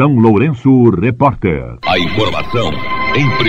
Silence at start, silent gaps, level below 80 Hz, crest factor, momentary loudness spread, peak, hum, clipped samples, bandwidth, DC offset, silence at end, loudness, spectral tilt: 0 s; none; -34 dBFS; 12 dB; 8 LU; 0 dBFS; none; 0.1%; 8 kHz; under 0.1%; 0 s; -13 LUFS; -7.5 dB/octave